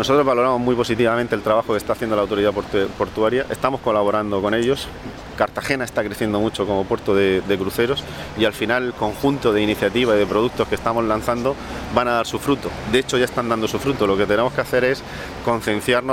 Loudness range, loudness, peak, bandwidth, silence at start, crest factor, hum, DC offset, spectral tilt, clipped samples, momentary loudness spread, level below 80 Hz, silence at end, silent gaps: 2 LU; -20 LUFS; -2 dBFS; 16.5 kHz; 0 s; 18 dB; none; under 0.1%; -5 dB/octave; under 0.1%; 5 LU; -42 dBFS; 0 s; none